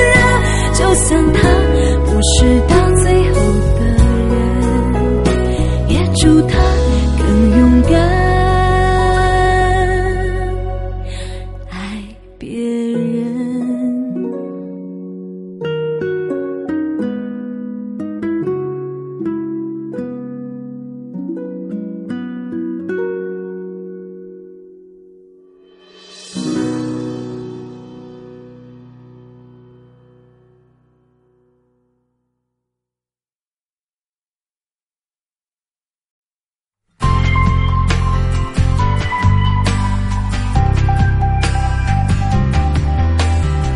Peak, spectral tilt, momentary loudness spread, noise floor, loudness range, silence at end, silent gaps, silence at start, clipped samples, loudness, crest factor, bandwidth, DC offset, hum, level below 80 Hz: 0 dBFS; -6 dB/octave; 17 LU; under -90 dBFS; 14 LU; 0 s; 33.35-33.40 s, 33.47-34.41 s, 34.66-34.70 s, 34.82-34.86 s, 35.21-35.26 s, 35.32-35.36 s, 35.95-35.99 s, 36.10-36.44 s; 0 s; under 0.1%; -15 LUFS; 16 dB; 11.5 kHz; under 0.1%; none; -20 dBFS